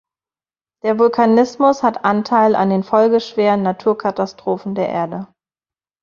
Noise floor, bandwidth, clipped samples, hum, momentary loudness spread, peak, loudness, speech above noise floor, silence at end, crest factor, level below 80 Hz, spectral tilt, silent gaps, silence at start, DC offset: under -90 dBFS; 7.2 kHz; under 0.1%; none; 9 LU; -2 dBFS; -16 LUFS; over 75 dB; 0.8 s; 16 dB; -60 dBFS; -7 dB/octave; none; 0.85 s; under 0.1%